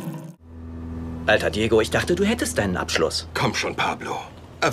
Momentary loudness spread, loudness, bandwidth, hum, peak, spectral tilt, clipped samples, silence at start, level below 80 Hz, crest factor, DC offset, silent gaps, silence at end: 17 LU; -22 LUFS; 16 kHz; none; -4 dBFS; -4.5 dB/octave; under 0.1%; 0 s; -42 dBFS; 20 dB; under 0.1%; none; 0 s